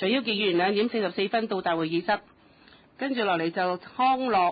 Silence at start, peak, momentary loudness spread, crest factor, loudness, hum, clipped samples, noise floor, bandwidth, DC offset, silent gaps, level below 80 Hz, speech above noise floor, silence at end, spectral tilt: 0 s; -12 dBFS; 6 LU; 14 dB; -26 LUFS; none; under 0.1%; -56 dBFS; 5 kHz; under 0.1%; none; -68 dBFS; 30 dB; 0 s; -9.5 dB/octave